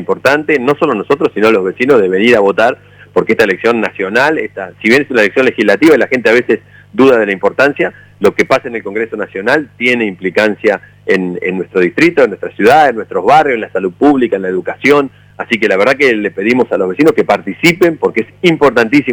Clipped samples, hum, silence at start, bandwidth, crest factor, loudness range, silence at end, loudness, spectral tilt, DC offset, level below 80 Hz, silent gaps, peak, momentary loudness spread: under 0.1%; 50 Hz at -45 dBFS; 0 s; over 20 kHz; 10 dB; 3 LU; 0 s; -11 LUFS; -5.5 dB/octave; under 0.1%; -50 dBFS; none; 0 dBFS; 8 LU